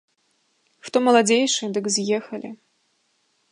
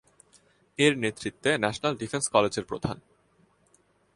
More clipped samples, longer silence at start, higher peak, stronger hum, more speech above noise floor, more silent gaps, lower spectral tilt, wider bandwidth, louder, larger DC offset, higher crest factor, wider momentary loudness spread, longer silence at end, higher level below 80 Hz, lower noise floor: neither; about the same, 0.85 s vs 0.8 s; about the same, -4 dBFS vs -6 dBFS; neither; first, 47 dB vs 39 dB; neither; about the same, -3 dB/octave vs -4 dB/octave; about the same, 11.5 kHz vs 11.5 kHz; first, -20 LUFS vs -27 LUFS; neither; about the same, 20 dB vs 24 dB; first, 18 LU vs 11 LU; second, 0.95 s vs 1.15 s; second, -76 dBFS vs -60 dBFS; about the same, -68 dBFS vs -65 dBFS